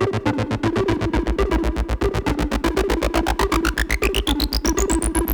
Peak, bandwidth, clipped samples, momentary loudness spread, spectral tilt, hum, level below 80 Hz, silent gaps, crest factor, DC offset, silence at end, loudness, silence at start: -4 dBFS; over 20 kHz; under 0.1%; 2 LU; -4.5 dB/octave; none; -26 dBFS; none; 16 dB; under 0.1%; 0 s; -21 LUFS; 0 s